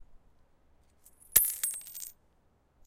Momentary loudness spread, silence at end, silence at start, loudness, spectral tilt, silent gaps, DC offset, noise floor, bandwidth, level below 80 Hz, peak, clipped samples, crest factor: 19 LU; 0.75 s; 0.1 s; -27 LUFS; 1 dB/octave; none; under 0.1%; -68 dBFS; 17 kHz; -62 dBFS; -4 dBFS; under 0.1%; 32 dB